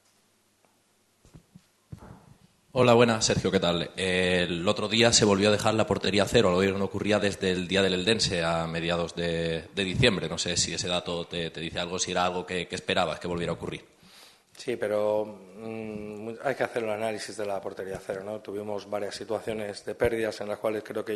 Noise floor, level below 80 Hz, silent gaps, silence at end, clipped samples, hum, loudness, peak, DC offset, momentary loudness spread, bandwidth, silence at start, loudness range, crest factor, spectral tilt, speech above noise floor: -67 dBFS; -54 dBFS; none; 0 s; under 0.1%; none; -27 LUFS; -4 dBFS; under 0.1%; 13 LU; 12.5 kHz; 1.35 s; 9 LU; 24 dB; -4 dB/octave; 40 dB